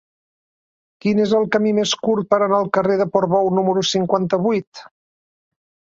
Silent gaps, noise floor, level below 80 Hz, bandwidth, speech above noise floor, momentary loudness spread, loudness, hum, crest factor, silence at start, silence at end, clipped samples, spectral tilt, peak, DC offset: 4.67-4.72 s; under -90 dBFS; -60 dBFS; 7.8 kHz; over 72 dB; 3 LU; -18 LUFS; none; 18 dB; 1.05 s; 1.1 s; under 0.1%; -5 dB/octave; -2 dBFS; under 0.1%